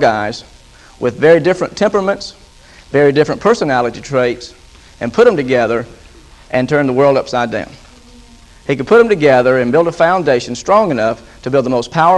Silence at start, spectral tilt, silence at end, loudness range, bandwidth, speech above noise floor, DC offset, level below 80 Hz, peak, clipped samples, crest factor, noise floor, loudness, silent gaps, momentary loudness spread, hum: 0 s; -6 dB/octave; 0 s; 3 LU; 10.5 kHz; 28 dB; under 0.1%; -44 dBFS; 0 dBFS; under 0.1%; 14 dB; -41 dBFS; -13 LUFS; none; 13 LU; none